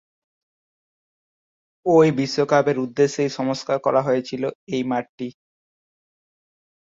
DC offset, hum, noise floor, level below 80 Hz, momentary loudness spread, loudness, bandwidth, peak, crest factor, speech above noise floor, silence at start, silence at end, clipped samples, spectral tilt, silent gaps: under 0.1%; none; under -90 dBFS; -66 dBFS; 12 LU; -21 LUFS; 7.8 kHz; -4 dBFS; 20 dB; over 70 dB; 1.85 s; 1.5 s; under 0.1%; -6 dB/octave; 4.55-4.67 s, 5.09-5.18 s